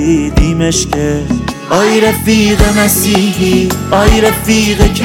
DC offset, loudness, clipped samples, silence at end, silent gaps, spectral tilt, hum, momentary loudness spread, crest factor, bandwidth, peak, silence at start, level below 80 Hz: under 0.1%; -10 LUFS; under 0.1%; 0 s; none; -4.5 dB/octave; none; 6 LU; 10 dB; 17 kHz; 0 dBFS; 0 s; -18 dBFS